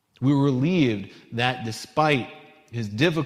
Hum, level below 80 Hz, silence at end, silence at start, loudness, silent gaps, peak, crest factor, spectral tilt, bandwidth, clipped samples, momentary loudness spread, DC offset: none; -58 dBFS; 0 s; 0.2 s; -24 LUFS; none; -6 dBFS; 18 dB; -6.5 dB/octave; 14.5 kHz; under 0.1%; 12 LU; under 0.1%